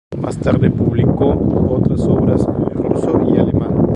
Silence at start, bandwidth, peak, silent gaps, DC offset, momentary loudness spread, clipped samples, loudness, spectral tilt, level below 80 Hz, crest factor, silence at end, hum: 0.1 s; 10.5 kHz; 0 dBFS; none; under 0.1%; 4 LU; under 0.1%; -15 LUFS; -9.5 dB/octave; -30 dBFS; 14 dB; 0 s; none